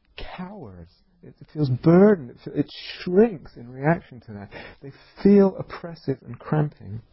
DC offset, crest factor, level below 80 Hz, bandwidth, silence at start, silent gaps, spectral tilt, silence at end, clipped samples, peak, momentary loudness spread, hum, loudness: under 0.1%; 18 dB; -52 dBFS; 5.8 kHz; 0.2 s; none; -12.5 dB/octave; 0.15 s; under 0.1%; -4 dBFS; 23 LU; none; -22 LUFS